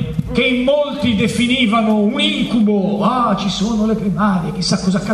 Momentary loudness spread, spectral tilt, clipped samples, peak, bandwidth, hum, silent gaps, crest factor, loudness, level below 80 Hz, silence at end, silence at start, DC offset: 4 LU; -5.5 dB/octave; under 0.1%; -2 dBFS; 12 kHz; none; none; 14 dB; -16 LUFS; -38 dBFS; 0 s; 0 s; under 0.1%